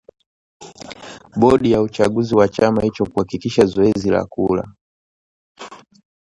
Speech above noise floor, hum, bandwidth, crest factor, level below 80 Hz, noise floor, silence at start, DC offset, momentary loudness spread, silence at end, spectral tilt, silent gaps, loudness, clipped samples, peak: 21 dB; none; 11.5 kHz; 18 dB; -46 dBFS; -37 dBFS; 0.6 s; under 0.1%; 22 LU; 0.55 s; -7 dB/octave; 4.81-5.55 s; -17 LUFS; under 0.1%; 0 dBFS